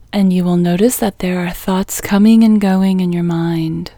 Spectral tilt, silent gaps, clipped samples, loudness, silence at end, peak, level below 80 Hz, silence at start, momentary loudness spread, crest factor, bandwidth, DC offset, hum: -6.5 dB/octave; none; under 0.1%; -14 LUFS; 0.1 s; 0 dBFS; -40 dBFS; 0.15 s; 9 LU; 12 dB; over 20 kHz; under 0.1%; none